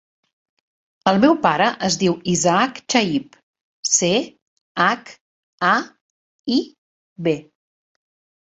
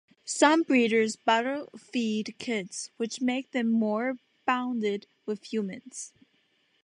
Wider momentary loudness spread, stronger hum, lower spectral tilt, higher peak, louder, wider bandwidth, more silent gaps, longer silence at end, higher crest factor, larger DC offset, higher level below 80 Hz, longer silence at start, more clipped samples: about the same, 12 LU vs 14 LU; neither; about the same, -3.5 dB/octave vs -3.5 dB/octave; first, 0 dBFS vs -8 dBFS; first, -19 LUFS vs -28 LUFS; second, 8.4 kHz vs 11 kHz; first, 3.43-3.54 s, 3.61-3.83 s, 4.42-4.75 s, 5.21-5.58 s, 6.01-6.44 s, 6.78-7.16 s vs none; first, 1.1 s vs 0.75 s; about the same, 22 dB vs 20 dB; neither; first, -60 dBFS vs -82 dBFS; first, 1.05 s vs 0.25 s; neither